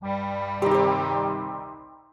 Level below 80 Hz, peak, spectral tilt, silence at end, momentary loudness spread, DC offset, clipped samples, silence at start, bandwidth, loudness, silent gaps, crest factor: -62 dBFS; -8 dBFS; -7.5 dB/octave; 0.15 s; 17 LU; under 0.1%; under 0.1%; 0 s; 10 kHz; -25 LUFS; none; 18 dB